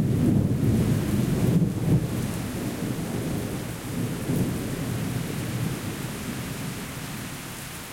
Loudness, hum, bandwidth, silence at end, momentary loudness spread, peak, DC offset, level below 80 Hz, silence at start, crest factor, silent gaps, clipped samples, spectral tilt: -27 LUFS; none; 17 kHz; 0 s; 11 LU; -10 dBFS; under 0.1%; -44 dBFS; 0 s; 16 dB; none; under 0.1%; -6.5 dB/octave